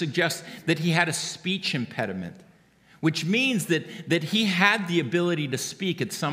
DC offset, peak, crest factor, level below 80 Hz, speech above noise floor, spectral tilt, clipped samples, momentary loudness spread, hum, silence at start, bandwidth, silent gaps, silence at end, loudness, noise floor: under 0.1%; -4 dBFS; 22 dB; -72 dBFS; 32 dB; -4.5 dB/octave; under 0.1%; 9 LU; none; 0 s; 16 kHz; none; 0 s; -25 LUFS; -57 dBFS